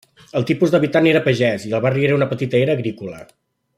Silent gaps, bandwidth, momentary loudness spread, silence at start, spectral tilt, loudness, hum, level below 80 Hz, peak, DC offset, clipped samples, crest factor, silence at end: none; 13.5 kHz; 11 LU; 0.35 s; -7 dB/octave; -18 LUFS; none; -58 dBFS; -2 dBFS; under 0.1%; under 0.1%; 16 dB; 0.55 s